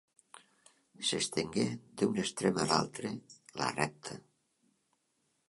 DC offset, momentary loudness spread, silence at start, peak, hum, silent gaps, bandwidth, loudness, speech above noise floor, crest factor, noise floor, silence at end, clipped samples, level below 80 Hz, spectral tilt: under 0.1%; 16 LU; 0.35 s; -10 dBFS; none; none; 11.5 kHz; -34 LUFS; 44 dB; 26 dB; -78 dBFS; 1.3 s; under 0.1%; -68 dBFS; -4 dB/octave